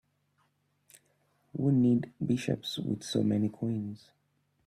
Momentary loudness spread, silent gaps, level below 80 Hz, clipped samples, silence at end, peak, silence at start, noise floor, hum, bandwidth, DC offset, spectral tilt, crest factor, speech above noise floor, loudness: 12 LU; none; -68 dBFS; under 0.1%; 0.7 s; -14 dBFS; 1.55 s; -74 dBFS; none; 14 kHz; under 0.1%; -7 dB/octave; 18 dB; 44 dB; -30 LUFS